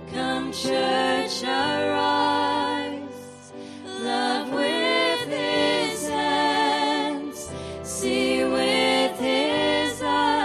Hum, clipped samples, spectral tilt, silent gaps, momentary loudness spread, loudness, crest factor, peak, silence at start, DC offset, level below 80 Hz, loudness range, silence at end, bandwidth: none; under 0.1%; -3 dB/octave; none; 13 LU; -23 LUFS; 14 dB; -10 dBFS; 0 s; under 0.1%; -56 dBFS; 2 LU; 0 s; 14 kHz